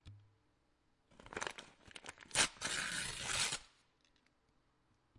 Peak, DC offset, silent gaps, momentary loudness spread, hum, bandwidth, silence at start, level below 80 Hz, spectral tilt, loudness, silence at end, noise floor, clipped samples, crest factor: -18 dBFS; under 0.1%; none; 19 LU; none; 11.5 kHz; 0.05 s; -66 dBFS; -0.5 dB/octave; -38 LUFS; 1.5 s; -77 dBFS; under 0.1%; 28 dB